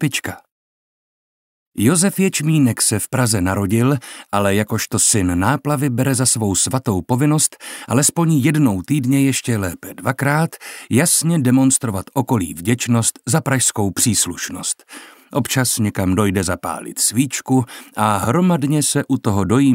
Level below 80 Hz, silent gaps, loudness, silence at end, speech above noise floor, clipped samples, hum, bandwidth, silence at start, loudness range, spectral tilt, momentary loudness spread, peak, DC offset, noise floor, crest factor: -50 dBFS; 0.52-1.72 s; -17 LUFS; 0 s; over 73 dB; under 0.1%; none; 16.5 kHz; 0 s; 2 LU; -4.5 dB/octave; 9 LU; -2 dBFS; under 0.1%; under -90 dBFS; 16 dB